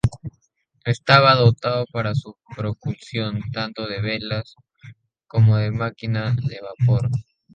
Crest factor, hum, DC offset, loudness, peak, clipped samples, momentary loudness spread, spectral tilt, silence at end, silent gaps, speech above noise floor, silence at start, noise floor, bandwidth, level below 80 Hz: 20 dB; none; under 0.1%; -21 LUFS; 0 dBFS; under 0.1%; 15 LU; -7 dB/octave; 0.35 s; none; 47 dB; 0.05 s; -67 dBFS; 8.8 kHz; -46 dBFS